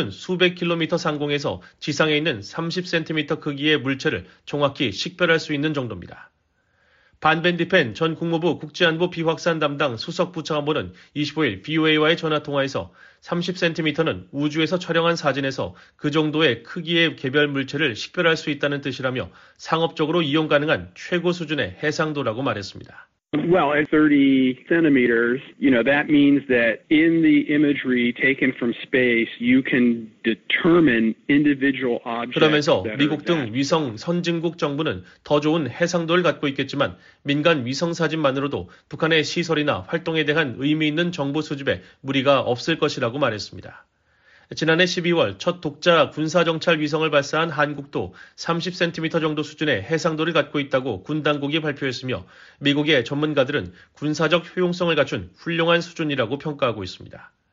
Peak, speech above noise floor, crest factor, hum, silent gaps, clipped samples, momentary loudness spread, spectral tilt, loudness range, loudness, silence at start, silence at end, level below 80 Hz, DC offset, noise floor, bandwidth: -2 dBFS; 44 dB; 18 dB; none; none; under 0.1%; 9 LU; -3.5 dB/octave; 5 LU; -21 LUFS; 0 s; 0.3 s; -60 dBFS; under 0.1%; -66 dBFS; 7.6 kHz